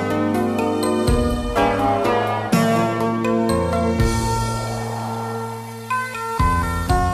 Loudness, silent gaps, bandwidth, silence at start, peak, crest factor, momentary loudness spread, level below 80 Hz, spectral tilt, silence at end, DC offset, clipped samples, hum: -20 LUFS; none; 15 kHz; 0 s; -4 dBFS; 14 dB; 8 LU; -30 dBFS; -6 dB/octave; 0 s; under 0.1%; under 0.1%; none